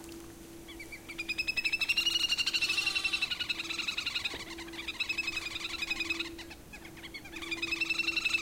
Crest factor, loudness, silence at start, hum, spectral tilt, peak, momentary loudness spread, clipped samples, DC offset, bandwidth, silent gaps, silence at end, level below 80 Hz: 18 dB; -31 LUFS; 0 s; none; -0.5 dB/octave; -18 dBFS; 18 LU; under 0.1%; under 0.1%; 16.5 kHz; none; 0 s; -58 dBFS